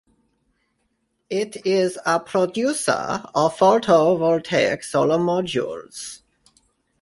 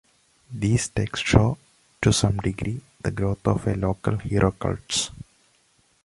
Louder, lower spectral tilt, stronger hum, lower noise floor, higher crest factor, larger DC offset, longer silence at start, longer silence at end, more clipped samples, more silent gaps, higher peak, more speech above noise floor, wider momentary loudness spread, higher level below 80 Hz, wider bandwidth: first, -20 LUFS vs -24 LUFS; about the same, -4.5 dB/octave vs -5 dB/octave; neither; first, -71 dBFS vs -63 dBFS; about the same, 18 dB vs 22 dB; neither; first, 1.3 s vs 0.5 s; about the same, 0.85 s vs 0.8 s; neither; neither; about the same, -4 dBFS vs -2 dBFS; first, 51 dB vs 40 dB; about the same, 12 LU vs 11 LU; second, -62 dBFS vs -38 dBFS; about the same, 11.5 kHz vs 11.5 kHz